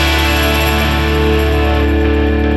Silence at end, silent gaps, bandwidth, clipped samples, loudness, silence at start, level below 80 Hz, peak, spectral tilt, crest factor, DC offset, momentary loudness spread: 0 s; none; 13.5 kHz; under 0.1%; -13 LUFS; 0 s; -16 dBFS; -2 dBFS; -5.5 dB/octave; 10 dB; under 0.1%; 1 LU